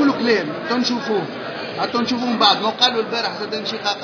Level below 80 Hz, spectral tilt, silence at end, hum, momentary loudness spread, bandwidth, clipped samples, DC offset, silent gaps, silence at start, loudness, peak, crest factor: -68 dBFS; -4 dB/octave; 0 s; none; 9 LU; 5.4 kHz; under 0.1%; under 0.1%; none; 0 s; -19 LUFS; 0 dBFS; 20 dB